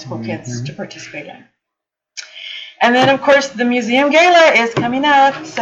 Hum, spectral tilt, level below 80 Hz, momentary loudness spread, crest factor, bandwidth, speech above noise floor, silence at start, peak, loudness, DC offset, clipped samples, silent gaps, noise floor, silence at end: none; -4 dB/octave; -60 dBFS; 20 LU; 12 dB; 8.6 kHz; 67 dB; 0 s; -2 dBFS; -12 LUFS; under 0.1%; under 0.1%; none; -81 dBFS; 0 s